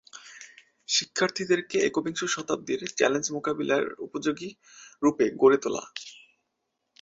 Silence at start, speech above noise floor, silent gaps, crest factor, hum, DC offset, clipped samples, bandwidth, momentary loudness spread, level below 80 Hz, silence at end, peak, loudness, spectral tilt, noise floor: 0.15 s; 53 dB; none; 22 dB; none; under 0.1%; under 0.1%; 8 kHz; 20 LU; -70 dBFS; 0.85 s; -6 dBFS; -26 LUFS; -3 dB/octave; -80 dBFS